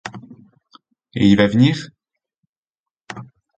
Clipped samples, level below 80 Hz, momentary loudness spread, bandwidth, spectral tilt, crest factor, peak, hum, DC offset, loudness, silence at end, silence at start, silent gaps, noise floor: under 0.1%; -50 dBFS; 24 LU; 8.6 kHz; -7 dB/octave; 20 dB; 0 dBFS; none; under 0.1%; -16 LUFS; 0.35 s; 0.05 s; 2.38-2.63 s, 2.70-2.86 s; -89 dBFS